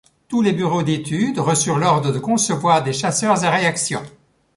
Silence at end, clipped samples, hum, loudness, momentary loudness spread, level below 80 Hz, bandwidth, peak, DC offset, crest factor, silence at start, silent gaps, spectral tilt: 0.45 s; under 0.1%; none; -18 LUFS; 5 LU; -56 dBFS; 11.5 kHz; -2 dBFS; under 0.1%; 16 dB; 0.3 s; none; -4.5 dB/octave